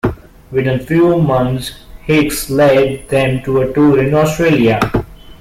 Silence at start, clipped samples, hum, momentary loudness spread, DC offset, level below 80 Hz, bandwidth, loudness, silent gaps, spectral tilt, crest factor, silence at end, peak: 0.05 s; under 0.1%; none; 10 LU; under 0.1%; -34 dBFS; 16.5 kHz; -13 LUFS; none; -6.5 dB/octave; 12 dB; 0.1 s; -2 dBFS